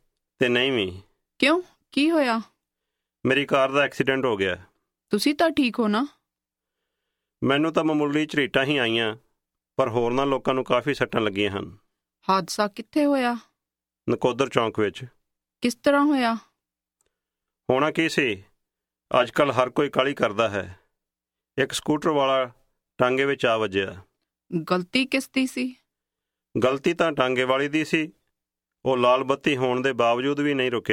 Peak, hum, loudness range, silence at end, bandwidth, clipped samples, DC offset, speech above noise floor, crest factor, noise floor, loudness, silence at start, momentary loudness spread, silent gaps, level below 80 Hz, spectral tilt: -2 dBFS; none; 3 LU; 0 s; 16 kHz; under 0.1%; under 0.1%; 65 dB; 22 dB; -88 dBFS; -23 LUFS; 0.4 s; 10 LU; none; -60 dBFS; -5 dB/octave